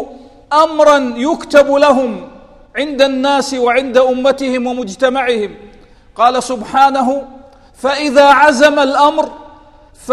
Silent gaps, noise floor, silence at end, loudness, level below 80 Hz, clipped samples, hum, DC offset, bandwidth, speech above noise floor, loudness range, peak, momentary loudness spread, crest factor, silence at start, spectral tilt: none; -41 dBFS; 0 s; -12 LUFS; -46 dBFS; 0.3%; none; under 0.1%; 13 kHz; 30 dB; 4 LU; 0 dBFS; 12 LU; 12 dB; 0 s; -3 dB/octave